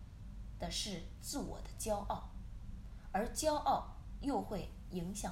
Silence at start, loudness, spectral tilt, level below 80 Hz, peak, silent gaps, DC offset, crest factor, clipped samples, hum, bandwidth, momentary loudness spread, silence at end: 0 s; -40 LUFS; -4 dB/octave; -50 dBFS; -22 dBFS; none; under 0.1%; 18 dB; under 0.1%; none; 16 kHz; 16 LU; 0 s